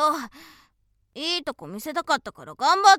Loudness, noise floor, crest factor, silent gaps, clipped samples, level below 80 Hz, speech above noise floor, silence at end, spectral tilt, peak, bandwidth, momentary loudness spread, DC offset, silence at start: -25 LUFS; -67 dBFS; 22 dB; none; under 0.1%; -66 dBFS; 44 dB; 0 s; -1.5 dB/octave; -2 dBFS; 16.5 kHz; 18 LU; under 0.1%; 0 s